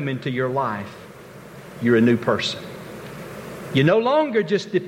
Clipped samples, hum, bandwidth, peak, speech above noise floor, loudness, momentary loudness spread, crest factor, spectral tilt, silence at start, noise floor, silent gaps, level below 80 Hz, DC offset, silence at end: under 0.1%; none; 16.5 kHz; -6 dBFS; 21 dB; -20 LUFS; 23 LU; 16 dB; -6.5 dB/octave; 0 s; -41 dBFS; none; -58 dBFS; under 0.1%; 0 s